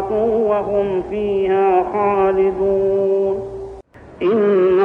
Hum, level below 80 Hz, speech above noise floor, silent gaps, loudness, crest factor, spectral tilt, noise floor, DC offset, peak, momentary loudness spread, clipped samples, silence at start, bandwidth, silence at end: none; -44 dBFS; 22 dB; none; -17 LUFS; 12 dB; -8.5 dB/octave; -38 dBFS; under 0.1%; -4 dBFS; 7 LU; under 0.1%; 0 s; 4 kHz; 0 s